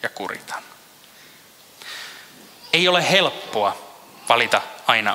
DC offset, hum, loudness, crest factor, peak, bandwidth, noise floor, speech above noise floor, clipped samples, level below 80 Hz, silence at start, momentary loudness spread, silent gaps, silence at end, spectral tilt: under 0.1%; none; -19 LUFS; 24 dB; 0 dBFS; 16 kHz; -48 dBFS; 28 dB; under 0.1%; -70 dBFS; 0 s; 20 LU; none; 0 s; -2.5 dB/octave